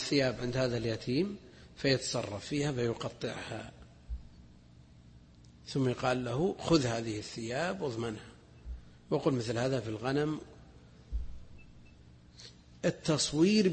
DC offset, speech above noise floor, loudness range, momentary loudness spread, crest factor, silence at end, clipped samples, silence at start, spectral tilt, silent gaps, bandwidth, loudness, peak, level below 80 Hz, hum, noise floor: under 0.1%; 25 dB; 6 LU; 21 LU; 20 dB; 0 s; under 0.1%; 0 s; -5 dB/octave; none; 8.8 kHz; -33 LUFS; -14 dBFS; -52 dBFS; 60 Hz at -60 dBFS; -57 dBFS